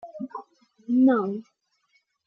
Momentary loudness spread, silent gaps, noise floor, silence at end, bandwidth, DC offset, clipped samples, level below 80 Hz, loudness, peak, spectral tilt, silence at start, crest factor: 21 LU; none; -70 dBFS; 0.85 s; 3.8 kHz; under 0.1%; under 0.1%; -82 dBFS; -23 LUFS; -10 dBFS; -9.5 dB/octave; 0.05 s; 16 dB